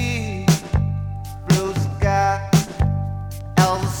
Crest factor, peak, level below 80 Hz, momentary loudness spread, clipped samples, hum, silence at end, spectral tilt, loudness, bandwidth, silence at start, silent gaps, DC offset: 18 dB; -2 dBFS; -32 dBFS; 10 LU; under 0.1%; 50 Hz at -40 dBFS; 0 s; -5.5 dB/octave; -21 LUFS; over 20 kHz; 0 s; none; under 0.1%